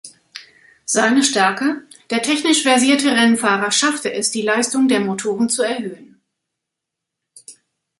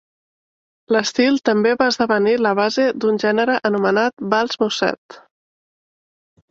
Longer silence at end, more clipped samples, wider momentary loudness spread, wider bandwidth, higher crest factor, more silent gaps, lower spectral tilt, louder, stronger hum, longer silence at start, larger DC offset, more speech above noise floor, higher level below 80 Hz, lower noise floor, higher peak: second, 0.45 s vs 1.3 s; neither; first, 17 LU vs 4 LU; first, 11.5 kHz vs 7.8 kHz; about the same, 18 dB vs 16 dB; second, none vs 4.13-4.17 s, 4.98-5.09 s; second, -2.5 dB/octave vs -4.5 dB/octave; about the same, -16 LUFS vs -18 LUFS; neither; second, 0.05 s vs 0.9 s; neither; second, 65 dB vs over 73 dB; second, -68 dBFS vs -62 dBFS; second, -81 dBFS vs under -90 dBFS; about the same, -2 dBFS vs -2 dBFS